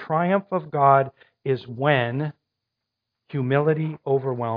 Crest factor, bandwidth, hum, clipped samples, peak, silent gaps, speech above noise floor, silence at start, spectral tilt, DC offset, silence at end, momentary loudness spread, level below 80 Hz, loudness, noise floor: 20 dB; 5.2 kHz; none; under 0.1%; -4 dBFS; none; 61 dB; 0 s; -10.5 dB/octave; under 0.1%; 0 s; 13 LU; -70 dBFS; -23 LUFS; -82 dBFS